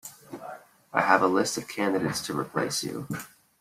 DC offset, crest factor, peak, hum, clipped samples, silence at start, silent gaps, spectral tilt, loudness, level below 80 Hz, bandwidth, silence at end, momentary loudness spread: under 0.1%; 24 dB; -4 dBFS; none; under 0.1%; 0.05 s; none; -4 dB/octave; -27 LUFS; -66 dBFS; 16 kHz; 0.35 s; 21 LU